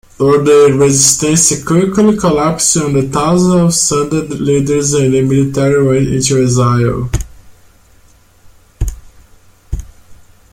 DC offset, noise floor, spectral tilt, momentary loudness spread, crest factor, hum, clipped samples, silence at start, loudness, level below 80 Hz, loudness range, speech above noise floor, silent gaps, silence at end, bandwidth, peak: under 0.1%; -45 dBFS; -5 dB/octave; 15 LU; 12 dB; none; under 0.1%; 0.2 s; -11 LUFS; -30 dBFS; 12 LU; 35 dB; none; 0.4 s; 16.5 kHz; 0 dBFS